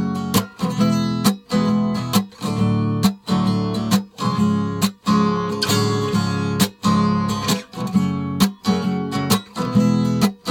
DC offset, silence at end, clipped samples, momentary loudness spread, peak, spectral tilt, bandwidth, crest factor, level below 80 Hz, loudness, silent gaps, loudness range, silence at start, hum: under 0.1%; 0 s; under 0.1%; 4 LU; -4 dBFS; -5.5 dB/octave; 17.5 kHz; 16 dB; -50 dBFS; -20 LUFS; none; 1 LU; 0 s; none